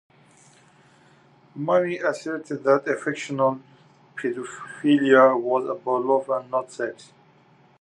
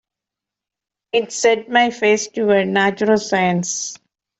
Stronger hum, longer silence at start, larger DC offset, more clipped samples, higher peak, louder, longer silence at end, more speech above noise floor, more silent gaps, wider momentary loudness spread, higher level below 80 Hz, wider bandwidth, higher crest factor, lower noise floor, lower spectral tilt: neither; first, 1.55 s vs 1.15 s; neither; neither; about the same, -4 dBFS vs -2 dBFS; second, -23 LUFS vs -17 LUFS; first, 0.75 s vs 0.45 s; second, 34 dB vs 69 dB; neither; first, 15 LU vs 7 LU; second, -80 dBFS vs -62 dBFS; first, 10 kHz vs 8.2 kHz; about the same, 20 dB vs 16 dB; second, -56 dBFS vs -86 dBFS; first, -6 dB/octave vs -3.5 dB/octave